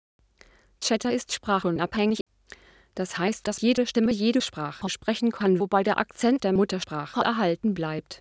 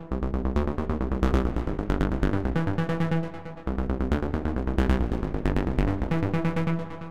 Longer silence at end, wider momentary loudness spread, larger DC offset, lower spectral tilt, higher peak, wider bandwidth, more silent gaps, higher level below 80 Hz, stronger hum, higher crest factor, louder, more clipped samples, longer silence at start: about the same, 0.05 s vs 0 s; first, 8 LU vs 5 LU; second, under 0.1% vs 2%; second, -5 dB/octave vs -8.5 dB/octave; about the same, -6 dBFS vs -8 dBFS; second, 8 kHz vs 9.2 kHz; first, 2.21-2.26 s vs none; second, -58 dBFS vs -30 dBFS; neither; about the same, 20 dB vs 18 dB; about the same, -26 LUFS vs -28 LUFS; neither; first, 0.8 s vs 0 s